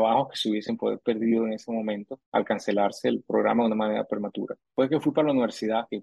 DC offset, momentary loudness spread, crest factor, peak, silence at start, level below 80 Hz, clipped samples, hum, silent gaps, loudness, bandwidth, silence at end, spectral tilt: under 0.1%; 7 LU; 16 dB; -10 dBFS; 0 s; -72 dBFS; under 0.1%; none; 2.26-2.32 s; -26 LUFS; 12 kHz; 0 s; -6 dB/octave